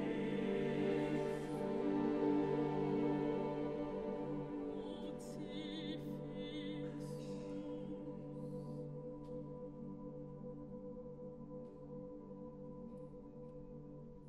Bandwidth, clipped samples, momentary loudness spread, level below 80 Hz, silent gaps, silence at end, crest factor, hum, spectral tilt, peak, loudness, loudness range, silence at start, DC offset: 12 kHz; under 0.1%; 14 LU; -64 dBFS; none; 0 s; 16 dB; none; -7.5 dB/octave; -26 dBFS; -43 LUFS; 13 LU; 0 s; under 0.1%